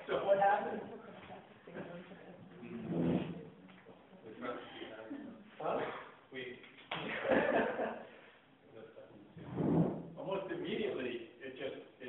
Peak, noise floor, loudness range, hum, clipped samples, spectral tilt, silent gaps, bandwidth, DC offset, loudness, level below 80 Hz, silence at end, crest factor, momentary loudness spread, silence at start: -18 dBFS; -62 dBFS; 7 LU; none; under 0.1%; -9 dB/octave; none; 4.1 kHz; under 0.1%; -38 LUFS; -70 dBFS; 0 s; 22 dB; 23 LU; 0 s